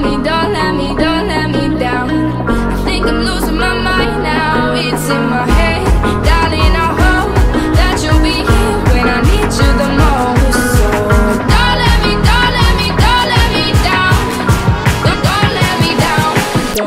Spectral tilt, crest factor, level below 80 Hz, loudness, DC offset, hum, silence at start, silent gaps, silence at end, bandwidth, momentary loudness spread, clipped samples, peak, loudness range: -5 dB/octave; 10 dB; -16 dBFS; -12 LUFS; under 0.1%; none; 0 s; none; 0 s; 16 kHz; 4 LU; under 0.1%; 0 dBFS; 3 LU